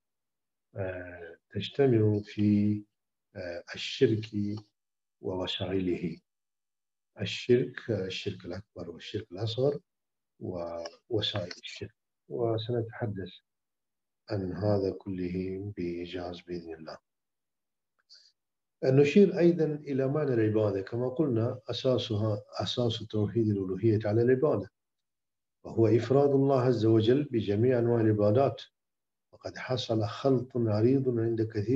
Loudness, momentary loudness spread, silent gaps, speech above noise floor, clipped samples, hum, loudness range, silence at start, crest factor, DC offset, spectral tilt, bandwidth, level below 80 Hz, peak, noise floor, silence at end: -29 LUFS; 17 LU; none; over 62 dB; under 0.1%; none; 9 LU; 0.75 s; 20 dB; under 0.1%; -7.5 dB/octave; 7.8 kHz; -66 dBFS; -10 dBFS; under -90 dBFS; 0 s